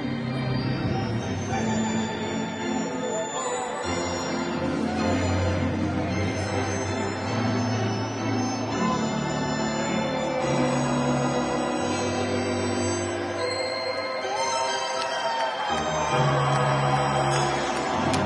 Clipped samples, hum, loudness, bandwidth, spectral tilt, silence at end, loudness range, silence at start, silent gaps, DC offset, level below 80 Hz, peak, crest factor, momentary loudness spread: under 0.1%; none; -26 LUFS; 11.5 kHz; -5 dB/octave; 0 s; 3 LU; 0 s; none; under 0.1%; -52 dBFS; -10 dBFS; 16 dB; 5 LU